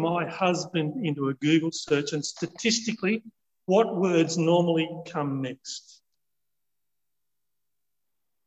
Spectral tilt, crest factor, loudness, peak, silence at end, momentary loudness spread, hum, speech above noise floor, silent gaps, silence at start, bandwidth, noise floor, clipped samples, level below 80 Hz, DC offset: -5 dB/octave; 20 dB; -26 LUFS; -8 dBFS; 2.65 s; 10 LU; none; 60 dB; none; 0 s; 8.8 kHz; -86 dBFS; under 0.1%; -74 dBFS; under 0.1%